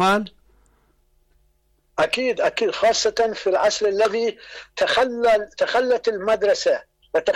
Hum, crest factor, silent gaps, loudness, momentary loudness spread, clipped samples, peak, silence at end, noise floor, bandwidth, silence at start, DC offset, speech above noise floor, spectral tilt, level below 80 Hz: none; 10 dB; none; -20 LUFS; 7 LU; under 0.1%; -10 dBFS; 0 s; -64 dBFS; 13.5 kHz; 0 s; under 0.1%; 43 dB; -2.5 dB/octave; -56 dBFS